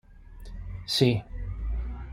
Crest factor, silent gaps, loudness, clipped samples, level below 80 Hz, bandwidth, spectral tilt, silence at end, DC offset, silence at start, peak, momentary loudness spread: 22 dB; none; -28 LUFS; under 0.1%; -36 dBFS; 16 kHz; -5.5 dB/octave; 0 s; under 0.1%; 0.1 s; -8 dBFS; 21 LU